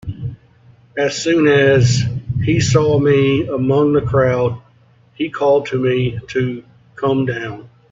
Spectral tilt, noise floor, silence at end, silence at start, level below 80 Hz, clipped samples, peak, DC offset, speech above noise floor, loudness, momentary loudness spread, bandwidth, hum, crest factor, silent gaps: -6 dB/octave; -51 dBFS; 0.25 s; 0.05 s; -42 dBFS; under 0.1%; 0 dBFS; under 0.1%; 36 dB; -16 LUFS; 16 LU; 7.8 kHz; none; 16 dB; none